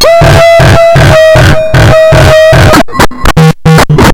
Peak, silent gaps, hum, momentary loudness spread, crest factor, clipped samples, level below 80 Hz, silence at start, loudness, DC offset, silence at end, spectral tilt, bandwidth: 0 dBFS; none; none; 3 LU; 2 dB; 30%; -14 dBFS; 0 s; -3 LUFS; under 0.1%; 0 s; -5.5 dB/octave; over 20 kHz